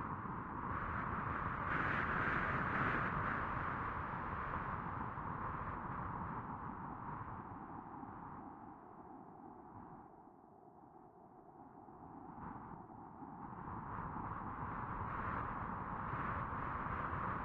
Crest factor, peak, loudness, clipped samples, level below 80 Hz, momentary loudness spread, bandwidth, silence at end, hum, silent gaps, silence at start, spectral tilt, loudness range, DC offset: 20 dB; -24 dBFS; -42 LUFS; under 0.1%; -58 dBFS; 20 LU; 7.2 kHz; 0 s; none; none; 0 s; -8.5 dB/octave; 17 LU; under 0.1%